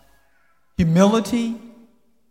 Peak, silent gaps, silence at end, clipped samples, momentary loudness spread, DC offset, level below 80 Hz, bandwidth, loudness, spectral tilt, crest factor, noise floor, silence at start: -4 dBFS; none; 0.65 s; under 0.1%; 18 LU; 0.1%; -44 dBFS; 15 kHz; -19 LUFS; -6.5 dB/octave; 18 dB; -64 dBFS; 0.8 s